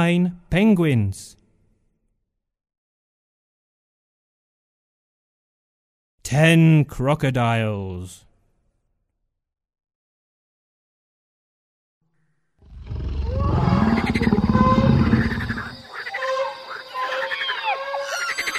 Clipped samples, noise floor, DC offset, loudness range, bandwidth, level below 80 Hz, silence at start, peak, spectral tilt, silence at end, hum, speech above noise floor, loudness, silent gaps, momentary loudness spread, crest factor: under 0.1%; -76 dBFS; under 0.1%; 12 LU; 13.5 kHz; -36 dBFS; 0 s; -4 dBFS; -6.5 dB/octave; 0 s; none; 58 dB; -20 LUFS; 2.78-6.18 s, 9.95-12.01 s; 16 LU; 20 dB